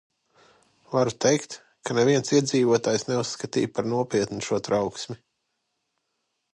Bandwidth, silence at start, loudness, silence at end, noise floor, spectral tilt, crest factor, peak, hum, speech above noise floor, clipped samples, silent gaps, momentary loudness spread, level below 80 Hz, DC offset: 11.5 kHz; 0.9 s; -24 LUFS; 1.4 s; -77 dBFS; -4.5 dB/octave; 18 dB; -8 dBFS; none; 53 dB; under 0.1%; none; 12 LU; -64 dBFS; under 0.1%